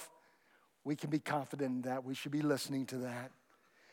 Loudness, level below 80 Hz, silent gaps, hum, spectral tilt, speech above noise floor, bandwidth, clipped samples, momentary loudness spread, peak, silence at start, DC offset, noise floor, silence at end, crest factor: -39 LUFS; under -90 dBFS; none; none; -5.5 dB/octave; 33 dB; 17.5 kHz; under 0.1%; 12 LU; -20 dBFS; 0 s; under 0.1%; -71 dBFS; 0.6 s; 20 dB